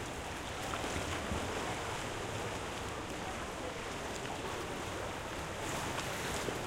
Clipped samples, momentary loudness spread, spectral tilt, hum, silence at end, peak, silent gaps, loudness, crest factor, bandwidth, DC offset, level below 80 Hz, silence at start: under 0.1%; 3 LU; -3.5 dB/octave; none; 0 s; -20 dBFS; none; -39 LUFS; 18 dB; 16 kHz; under 0.1%; -52 dBFS; 0 s